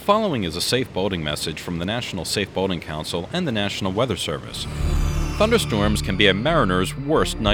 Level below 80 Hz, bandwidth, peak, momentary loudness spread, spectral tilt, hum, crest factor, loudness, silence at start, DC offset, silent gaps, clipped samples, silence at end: -32 dBFS; 19 kHz; -2 dBFS; 9 LU; -4.5 dB/octave; none; 20 dB; -22 LUFS; 0 s; under 0.1%; none; under 0.1%; 0 s